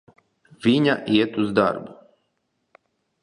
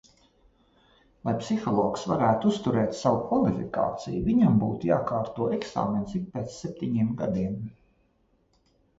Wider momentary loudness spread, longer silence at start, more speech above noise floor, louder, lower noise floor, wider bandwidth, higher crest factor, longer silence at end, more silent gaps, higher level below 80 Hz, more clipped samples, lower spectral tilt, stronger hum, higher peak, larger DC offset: about the same, 10 LU vs 10 LU; second, 0.6 s vs 1.25 s; first, 53 dB vs 42 dB; first, -21 LUFS vs -27 LUFS; first, -73 dBFS vs -67 dBFS; first, 10.5 kHz vs 8 kHz; about the same, 20 dB vs 18 dB; about the same, 1.3 s vs 1.25 s; neither; second, -62 dBFS vs -54 dBFS; neither; about the same, -6.5 dB/octave vs -7.5 dB/octave; neither; first, -4 dBFS vs -10 dBFS; neither